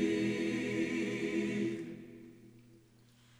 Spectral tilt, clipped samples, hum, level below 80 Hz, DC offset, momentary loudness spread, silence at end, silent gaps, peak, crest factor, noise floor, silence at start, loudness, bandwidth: -5.5 dB/octave; under 0.1%; none; -70 dBFS; under 0.1%; 19 LU; 0.6 s; none; -20 dBFS; 18 dB; -64 dBFS; 0 s; -35 LUFS; 12 kHz